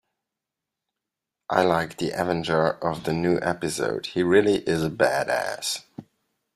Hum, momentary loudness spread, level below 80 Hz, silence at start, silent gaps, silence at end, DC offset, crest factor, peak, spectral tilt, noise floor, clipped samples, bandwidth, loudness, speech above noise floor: none; 8 LU; -58 dBFS; 1.5 s; none; 0.55 s; under 0.1%; 22 dB; -4 dBFS; -5 dB/octave; -86 dBFS; under 0.1%; 14.5 kHz; -24 LUFS; 63 dB